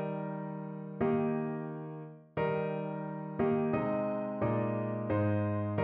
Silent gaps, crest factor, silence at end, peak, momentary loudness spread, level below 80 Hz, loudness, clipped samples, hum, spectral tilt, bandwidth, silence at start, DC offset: none; 14 dB; 0 s; -18 dBFS; 10 LU; -64 dBFS; -34 LUFS; under 0.1%; none; -8.5 dB/octave; 4.4 kHz; 0 s; under 0.1%